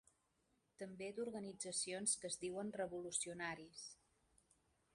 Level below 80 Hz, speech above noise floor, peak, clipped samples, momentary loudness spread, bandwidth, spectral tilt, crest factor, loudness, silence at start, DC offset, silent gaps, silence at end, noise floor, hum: -82 dBFS; 36 dB; -26 dBFS; under 0.1%; 14 LU; 11.5 kHz; -2.5 dB/octave; 22 dB; -45 LUFS; 0.8 s; under 0.1%; none; 1 s; -83 dBFS; none